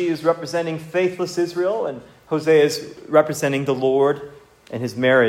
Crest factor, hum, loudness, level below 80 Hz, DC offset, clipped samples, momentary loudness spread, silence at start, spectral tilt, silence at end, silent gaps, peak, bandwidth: 18 dB; none; -21 LUFS; -64 dBFS; under 0.1%; under 0.1%; 12 LU; 0 s; -5.5 dB/octave; 0 s; none; -2 dBFS; 16 kHz